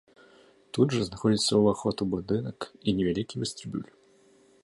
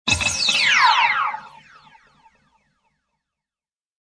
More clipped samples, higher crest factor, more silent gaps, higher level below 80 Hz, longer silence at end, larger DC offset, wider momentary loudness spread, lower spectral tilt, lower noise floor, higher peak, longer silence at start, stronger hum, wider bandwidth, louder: neither; about the same, 20 dB vs 20 dB; neither; second, -56 dBFS vs -50 dBFS; second, 0.8 s vs 2.55 s; neither; first, 14 LU vs 11 LU; first, -5.5 dB/octave vs -0.5 dB/octave; second, -60 dBFS vs under -90 dBFS; second, -10 dBFS vs -4 dBFS; first, 0.75 s vs 0.05 s; neither; about the same, 11.5 kHz vs 11 kHz; second, -28 LUFS vs -16 LUFS